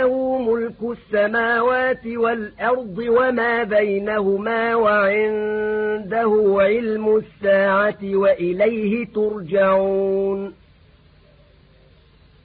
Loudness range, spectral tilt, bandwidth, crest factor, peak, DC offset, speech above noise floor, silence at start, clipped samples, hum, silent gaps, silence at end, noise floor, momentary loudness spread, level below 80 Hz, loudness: 3 LU; -11 dB/octave; 4.7 kHz; 14 dB; -6 dBFS; under 0.1%; 33 dB; 0 s; under 0.1%; none; none; 1.9 s; -51 dBFS; 6 LU; -52 dBFS; -19 LUFS